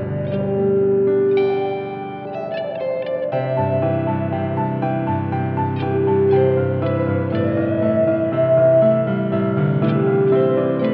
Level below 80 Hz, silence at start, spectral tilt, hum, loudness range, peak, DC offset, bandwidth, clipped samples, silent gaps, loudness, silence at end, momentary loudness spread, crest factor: -56 dBFS; 0 s; -11.5 dB/octave; none; 5 LU; -4 dBFS; under 0.1%; 4.9 kHz; under 0.1%; none; -19 LUFS; 0 s; 8 LU; 14 dB